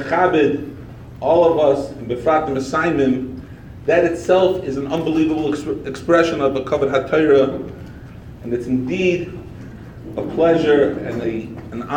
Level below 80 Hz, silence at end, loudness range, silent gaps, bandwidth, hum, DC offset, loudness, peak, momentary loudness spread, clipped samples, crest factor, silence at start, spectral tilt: -44 dBFS; 0 s; 2 LU; none; 10.5 kHz; none; under 0.1%; -18 LUFS; -2 dBFS; 20 LU; under 0.1%; 16 dB; 0 s; -6.5 dB/octave